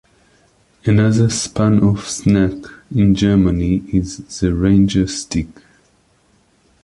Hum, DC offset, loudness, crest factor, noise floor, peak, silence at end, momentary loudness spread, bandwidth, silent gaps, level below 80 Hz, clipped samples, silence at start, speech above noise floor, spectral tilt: none; under 0.1%; -16 LUFS; 14 dB; -56 dBFS; -2 dBFS; 1.4 s; 10 LU; 11.5 kHz; none; -34 dBFS; under 0.1%; 0.85 s; 42 dB; -6 dB/octave